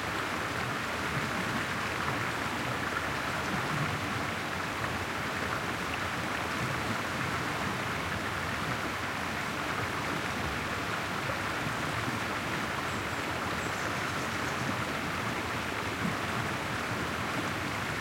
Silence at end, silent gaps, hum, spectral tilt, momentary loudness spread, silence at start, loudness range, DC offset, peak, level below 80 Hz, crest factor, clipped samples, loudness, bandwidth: 0 s; none; none; -4 dB/octave; 1 LU; 0 s; 1 LU; under 0.1%; -16 dBFS; -54 dBFS; 16 dB; under 0.1%; -32 LUFS; 16.5 kHz